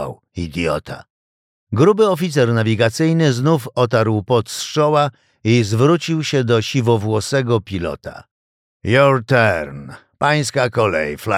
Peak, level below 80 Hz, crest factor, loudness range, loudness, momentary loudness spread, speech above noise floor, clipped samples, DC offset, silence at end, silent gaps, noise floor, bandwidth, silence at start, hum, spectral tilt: -2 dBFS; -48 dBFS; 16 dB; 2 LU; -17 LUFS; 12 LU; over 74 dB; under 0.1%; under 0.1%; 0 s; 1.10-1.67 s, 8.31-8.80 s; under -90 dBFS; 15.5 kHz; 0 s; none; -6 dB/octave